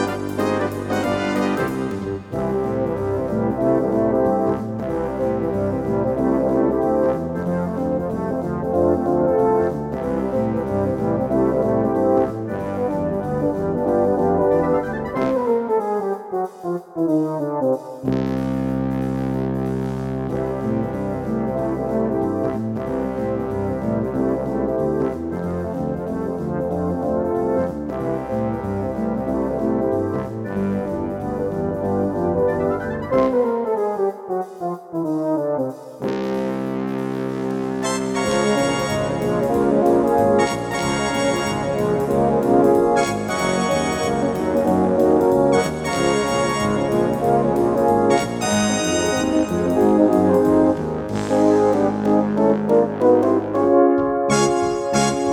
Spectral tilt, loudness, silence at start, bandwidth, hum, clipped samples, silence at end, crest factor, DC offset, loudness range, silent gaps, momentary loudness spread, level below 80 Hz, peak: -6 dB/octave; -20 LUFS; 0 s; 17 kHz; none; under 0.1%; 0 s; 16 dB; under 0.1%; 6 LU; none; 8 LU; -44 dBFS; -2 dBFS